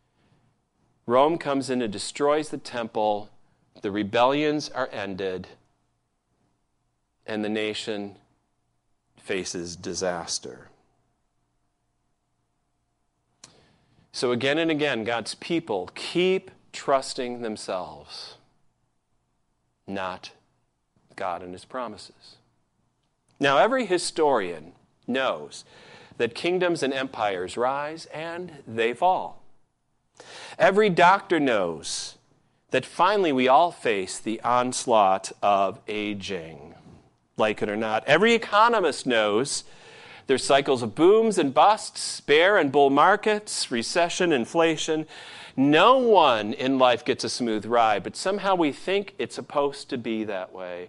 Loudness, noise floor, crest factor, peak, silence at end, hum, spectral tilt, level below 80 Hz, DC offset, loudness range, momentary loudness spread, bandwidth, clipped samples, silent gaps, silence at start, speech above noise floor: -24 LUFS; -73 dBFS; 22 dB; -4 dBFS; 0 s; none; -4 dB/octave; -64 dBFS; under 0.1%; 13 LU; 16 LU; 11.5 kHz; under 0.1%; none; 1.05 s; 50 dB